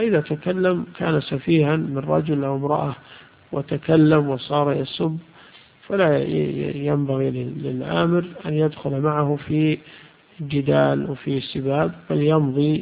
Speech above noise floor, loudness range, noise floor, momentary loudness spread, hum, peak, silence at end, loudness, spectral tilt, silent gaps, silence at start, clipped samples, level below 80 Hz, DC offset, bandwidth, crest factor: 28 dB; 2 LU; -49 dBFS; 8 LU; none; -4 dBFS; 0 s; -21 LUFS; -12.5 dB/octave; none; 0 s; under 0.1%; -54 dBFS; under 0.1%; 5 kHz; 18 dB